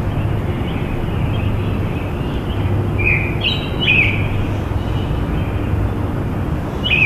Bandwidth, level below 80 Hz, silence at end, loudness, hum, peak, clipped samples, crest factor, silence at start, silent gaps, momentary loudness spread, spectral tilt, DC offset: 14 kHz; -26 dBFS; 0 s; -18 LUFS; none; -2 dBFS; under 0.1%; 16 dB; 0 s; none; 7 LU; -7 dB/octave; under 0.1%